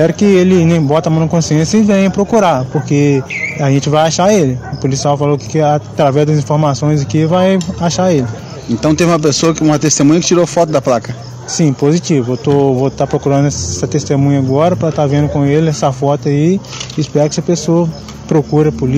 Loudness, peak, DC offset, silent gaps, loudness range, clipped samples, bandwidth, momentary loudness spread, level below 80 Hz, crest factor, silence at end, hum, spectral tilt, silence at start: -12 LUFS; 0 dBFS; under 0.1%; none; 2 LU; under 0.1%; 12 kHz; 6 LU; -40 dBFS; 12 dB; 0 s; none; -6 dB/octave; 0 s